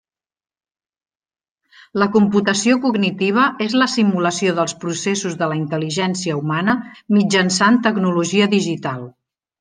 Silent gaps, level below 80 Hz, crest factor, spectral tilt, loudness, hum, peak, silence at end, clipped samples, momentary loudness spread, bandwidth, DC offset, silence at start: none; -62 dBFS; 16 dB; -4.5 dB/octave; -17 LUFS; none; -2 dBFS; 0.5 s; under 0.1%; 8 LU; 10 kHz; under 0.1%; 1.95 s